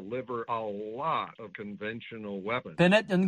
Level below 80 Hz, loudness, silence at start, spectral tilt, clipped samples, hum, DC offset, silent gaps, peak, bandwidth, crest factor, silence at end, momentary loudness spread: -68 dBFS; -31 LUFS; 0 s; -6.5 dB/octave; under 0.1%; none; under 0.1%; none; -10 dBFS; 9.8 kHz; 20 dB; 0 s; 16 LU